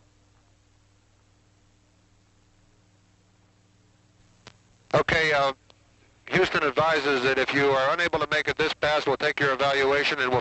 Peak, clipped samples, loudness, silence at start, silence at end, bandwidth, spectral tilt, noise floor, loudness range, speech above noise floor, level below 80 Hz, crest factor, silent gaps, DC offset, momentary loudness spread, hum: -8 dBFS; under 0.1%; -23 LUFS; 4.45 s; 0 s; 8.2 kHz; -4.5 dB/octave; -61 dBFS; 5 LU; 38 dB; -56 dBFS; 18 dB; none; under 0.1%; 4 LU; 60 Hz at -65 dBFS